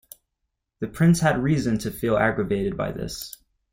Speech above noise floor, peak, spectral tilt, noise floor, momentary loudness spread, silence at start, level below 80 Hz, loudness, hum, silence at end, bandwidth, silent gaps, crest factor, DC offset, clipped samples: 57 dB; -8 dBFS; -6.5 dB/octave; -80 dBFS; 15 LU; 0.8 s; -46 dBFS; -23 LUFS; none; 0.45 s; 16.5 kHz; none; 16 dB; under 0.1%; under 0.1%